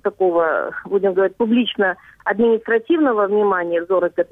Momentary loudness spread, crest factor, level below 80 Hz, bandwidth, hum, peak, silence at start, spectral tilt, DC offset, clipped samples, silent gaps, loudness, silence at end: 5 LU; 12 dB; -60 dBFS; 3.9 kHz; none; -6 dBFS; 0.05 s; -8 dB/octave; under 0.1%; under 0.1%; none; -18 LUFS; 0.05 s